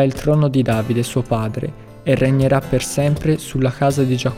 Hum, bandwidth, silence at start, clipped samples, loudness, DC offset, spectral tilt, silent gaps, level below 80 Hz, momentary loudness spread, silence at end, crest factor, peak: none; 16 kHz; 0 s; under 0.1%; -18 LUFS; under 0.1%; -6.5 dB/octave; none; -38 dBFS; 6 LU; 0 s; 14 dB; -4 dBFS